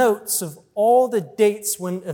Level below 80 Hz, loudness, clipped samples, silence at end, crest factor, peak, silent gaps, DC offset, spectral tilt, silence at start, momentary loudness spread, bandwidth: -72 dBFS; -20 LUFS; under 0.1%; 0 s; 16 dB; -4 dBFS; none; under 0.1%; -4 dB/octave; 0 s; 8 LU; 18 kHz